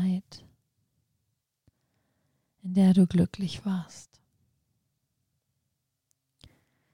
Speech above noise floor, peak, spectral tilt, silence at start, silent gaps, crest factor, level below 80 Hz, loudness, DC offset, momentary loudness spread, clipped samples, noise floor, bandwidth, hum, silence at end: 56 dB; -12 dBFS; -8 dB/octave; 0 s; none; 20 dB; -64 dBFS; -26 LUFS; under 0.1%; 16 LU; under 0.1%; -81 dBFS; 11.5 kHz; none; 2.9 s